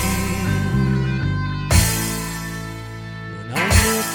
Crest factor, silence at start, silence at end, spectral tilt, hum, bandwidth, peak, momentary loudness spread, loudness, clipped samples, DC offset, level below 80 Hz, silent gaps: 20 dB; 0 s; 0 s; -4.5 dB/octave; none; 17.5 kHz; 0 dBFS; 16 LU; -20 LUFS; under 0.1%; under 0.1%; -28 dBFS; none